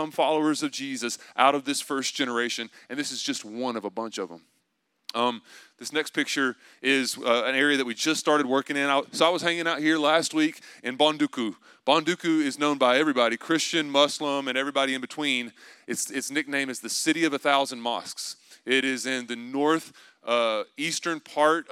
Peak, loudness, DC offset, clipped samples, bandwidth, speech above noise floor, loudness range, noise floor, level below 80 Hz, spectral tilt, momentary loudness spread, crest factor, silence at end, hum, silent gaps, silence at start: -4 dBFS; -25 LUFS; under 0.1%; under 0.1%; 16 kHz; 49 dB; 6 LU; -75 dBFS; -88 dBFS; -2.5 dB/octave; 11 LU; 22 dB; 0.1 s; none; none; 0 s